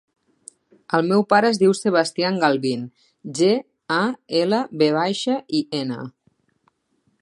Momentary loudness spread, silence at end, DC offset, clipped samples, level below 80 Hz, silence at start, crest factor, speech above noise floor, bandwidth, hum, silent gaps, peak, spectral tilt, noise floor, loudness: 12 LU; 1.1 s; under 0.1%; under 0.1%; -72 dBFS; 0.9 s; 20 dB; 48 dB; 11.5 kHz; none; none; -2 dBFS; -5 dB/octave; -68 dBFS; -20 LUFS